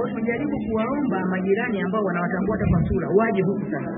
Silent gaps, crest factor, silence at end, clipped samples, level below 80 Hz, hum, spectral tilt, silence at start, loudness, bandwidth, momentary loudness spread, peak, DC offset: none; 16 dB; 0 s; under 0.1%; -40 dBFS; none; -12.5 dB/octave; 0 s; -23 LUFS; 3.8 kHz; 5 LU; -6 dBFS; under 0.1%